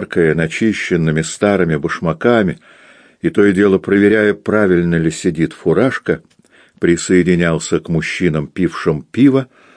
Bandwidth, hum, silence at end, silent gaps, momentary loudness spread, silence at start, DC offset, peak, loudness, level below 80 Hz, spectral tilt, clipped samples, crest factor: 10.5 kHz; none; 0.3 s; none; 7 LU; 0 s; under 0.1%; 0 dBFS; -15 LUFS; -44 dBFS; -6 dB/octave; under 0.1%; 14 dB